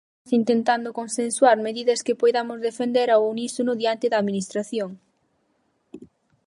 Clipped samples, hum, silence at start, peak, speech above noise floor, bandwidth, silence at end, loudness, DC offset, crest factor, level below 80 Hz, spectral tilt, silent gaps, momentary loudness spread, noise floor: under 0.1%; none; 0.25 s; -4 dBFS; 47 dB; 11.5 kHz; 0.4 s; -22 LUFS; under 0.1%; 20 dB; -76 dBFS; -4 dB/octave; none; 9 LU; -69 dBFS